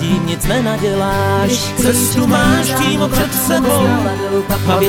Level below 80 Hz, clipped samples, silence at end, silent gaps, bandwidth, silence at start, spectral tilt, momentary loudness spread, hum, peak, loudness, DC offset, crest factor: -30 dBFS; under 0.1%; 0 s; none; 19 kHz; 0 s; -4.5 dB/octave; 4 LU; none; 0 dBFS; -14 LUFS; under 0.1%; 14 dB